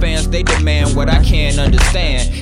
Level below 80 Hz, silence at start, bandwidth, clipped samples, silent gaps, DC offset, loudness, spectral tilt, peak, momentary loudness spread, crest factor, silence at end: -14 dBFS; 0 s; 13.5 kHz; under 0.1%; none; under 0.1%; -14 LUFS; -4.5 dB/octave; 0 dBFS; 3 LU; 12 dB; 0 s